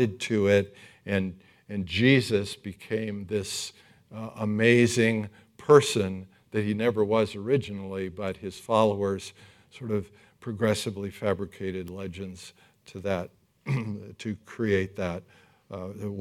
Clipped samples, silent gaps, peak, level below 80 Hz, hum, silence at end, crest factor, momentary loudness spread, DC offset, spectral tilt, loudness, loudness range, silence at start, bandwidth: under 0.1%; none; -6 dBFS; -66 dBFS; none; 0 s; 22 dB; 19 LU; under 0.1%; -5.5 dB/octave; -27 LUFS; 8 LU; 0 s; 15 kHz